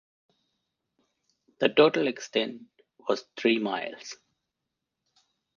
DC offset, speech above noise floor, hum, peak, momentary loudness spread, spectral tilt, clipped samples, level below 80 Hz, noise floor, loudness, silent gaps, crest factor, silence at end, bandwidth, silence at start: under 0.1%; 59 dB; none; -4 dBFS; 21 LU; -4.5 dB/octave; under 0.1%; -76 dBFS; -85 dBFS; -27 LUFS; none; 26 dB; 1.45 s; 7.2 kHz; 1.6 s